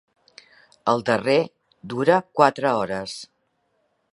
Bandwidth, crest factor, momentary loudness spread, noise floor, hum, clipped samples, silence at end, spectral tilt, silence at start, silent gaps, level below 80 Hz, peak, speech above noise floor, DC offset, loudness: 11.5 kHz; 22 dB; 14 LU; -70 dBFS; none; under 0.1%; 0.9 s; -5.5 dB/octave; 0.85 s; none; -64 dBFS; 0 dBFS; 49 dB; under 0.1%; -22 LUFS